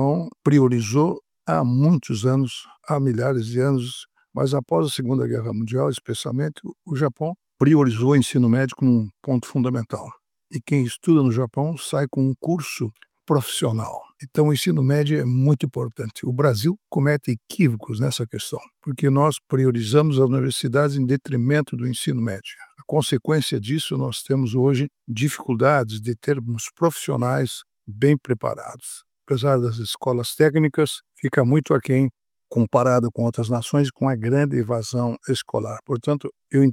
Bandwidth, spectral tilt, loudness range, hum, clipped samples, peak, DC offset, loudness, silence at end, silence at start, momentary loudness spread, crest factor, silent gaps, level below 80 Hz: 16 kHz; -6.5 dB/octave; 3 LU; none; under 0.1%; -2 dBFS; under 0.1%; -22 LUFS; 0 s; 0 s; 10 LU; 18 dB; none; -64 dBFS